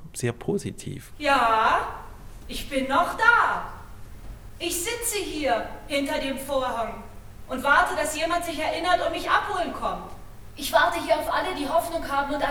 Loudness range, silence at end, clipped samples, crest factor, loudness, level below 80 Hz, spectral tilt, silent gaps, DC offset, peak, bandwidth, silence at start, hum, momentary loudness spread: 5 LU; 0 s; under 0.1%; 20 dB; -24 LUFS; -44 dBFS; -3 dB/octave; none; under 0.1%; -6 dBFS; over 20 kHz; 0 s; none; 17 LU